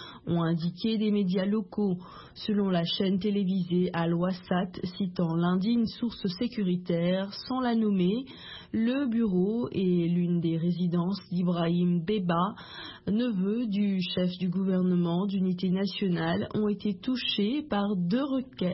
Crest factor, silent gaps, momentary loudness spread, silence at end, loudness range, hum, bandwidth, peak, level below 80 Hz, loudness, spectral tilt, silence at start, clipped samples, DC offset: 12 dB; none; 5 LU; 0 s; 1 LU; none; 5.8 kHz; -14 dBFS; -62 dBFS; -28 LUFS; -11 dB/octave; 0 s; under 0.1%; under 0.1%